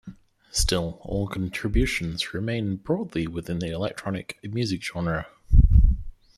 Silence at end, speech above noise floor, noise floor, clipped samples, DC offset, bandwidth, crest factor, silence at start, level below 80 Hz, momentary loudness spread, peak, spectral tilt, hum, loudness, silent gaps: 0.25 s; 19 dB; -46 dBFS; under 0.1%; under 0.1%; 13.5 kHz; 18 dB; 0.05 s; -26 dBFS; 11 LU; -4 dBFS; -5 dB/octave; none; -26 LUFS; none